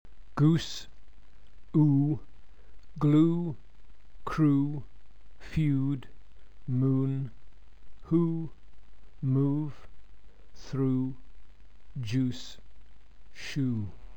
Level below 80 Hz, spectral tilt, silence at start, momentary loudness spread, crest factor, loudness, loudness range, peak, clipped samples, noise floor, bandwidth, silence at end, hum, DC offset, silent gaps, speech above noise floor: -52 dBFS; -8 dB/octave; 0.2 s; 18 LU; 18 dB; -29 LUFS; 6 LU; -12 dBFS; under 0.1%; -55 dBFS; 8.4 kHz; 0.05 s; none; 1%; none; 27 dB